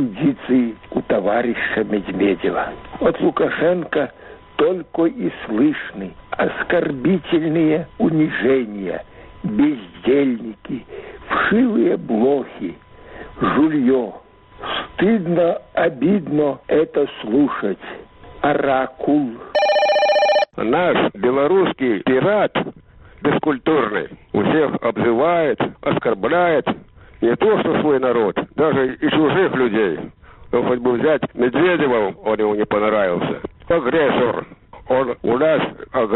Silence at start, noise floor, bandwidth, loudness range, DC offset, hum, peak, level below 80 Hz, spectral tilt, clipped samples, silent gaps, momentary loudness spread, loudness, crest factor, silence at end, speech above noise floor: 0 s; -38 dBFS; 6 kHz; 3 LU; under 0.1%; none; -4 dBFS; -50 dBFS; -4.5 dB/octave; under 0.1%; none; 10 LU; -18 LUFS; 14 dB; 0 s; 20 dB